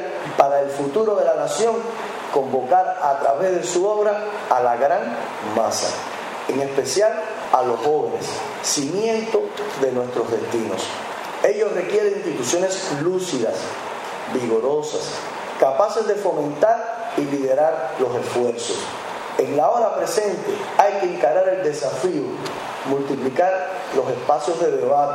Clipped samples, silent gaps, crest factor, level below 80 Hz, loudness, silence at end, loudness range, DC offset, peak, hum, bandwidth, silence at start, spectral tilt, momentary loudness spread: under 0.1%; none; 20 dB; -68 dBFS; -21 LUFS; 0 s; 2 LU; under 0.1%; 0 dBFS; none; 16 kHz; 0 s; -3.5 dB/octave; 9 LU